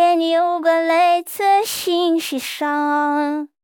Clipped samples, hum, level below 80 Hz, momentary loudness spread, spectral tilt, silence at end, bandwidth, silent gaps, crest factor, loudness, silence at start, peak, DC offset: under 0.1%; none; -72 dBFS; 6 LU; -1.5 dB/octave; 0.2 s; 19.5 kHz; none; 12 dB; -18 LUFS; 0 s; -6 dBFS; under 0.1%